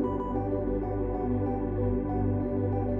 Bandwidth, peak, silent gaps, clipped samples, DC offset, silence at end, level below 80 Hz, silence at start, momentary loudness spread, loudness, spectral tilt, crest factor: 3.3 kHz; -16 dBFS; none; under 0.1%; under 0.1%; 0 s; -38 dBFS; 0 s; 2 LU; -30 LUFS; -12.5 dB/octave; 12 dB